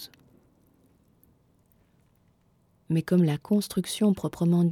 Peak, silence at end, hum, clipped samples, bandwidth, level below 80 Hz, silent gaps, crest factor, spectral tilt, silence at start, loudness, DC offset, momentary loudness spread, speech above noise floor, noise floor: -12 dBFS; 0 s; none; under 0.1%; 15 kHz; -64 dBFS; none; 16 dB; -7 dB/octave; 0 s; -26 LUFS; under 0.1%; 6 LU; 41 dB; -65 dBFS